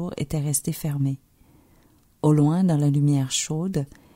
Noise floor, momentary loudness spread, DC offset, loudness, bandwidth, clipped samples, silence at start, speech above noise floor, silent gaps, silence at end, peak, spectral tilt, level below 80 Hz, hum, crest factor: -58 dBFS; 9 LU; under 0.1%; -23 LUFS; 16 kHz; under 0.1%; 0 s; 36 dB; none; 0.3 s; -8 dBFS; -6 dB/octave; -52 dBFS; none; 16 dB